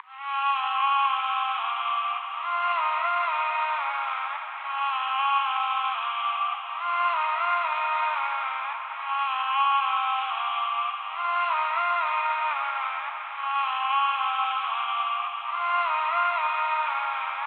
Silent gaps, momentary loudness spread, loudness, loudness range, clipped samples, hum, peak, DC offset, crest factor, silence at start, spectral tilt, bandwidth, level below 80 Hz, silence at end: none; 6 LU; -26 LUFS; 1 LU; under 0.1%; none; -14 dBFS; under 0.1%; 14 dB; 0.05 s; 4.5 dB/octave; 4.7 kHz; under -90 dBFS; 0 s